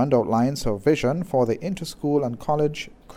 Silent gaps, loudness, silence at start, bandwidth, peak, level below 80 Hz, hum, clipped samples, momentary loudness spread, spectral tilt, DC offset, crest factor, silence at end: none; -23 LUFS; 0 s; 16 kHz; -8 dBFS; -44 dBFS; none; under 0.1%; 7 LU; -6.5 dB/octave; under 0.1%; 16 dB; 0 s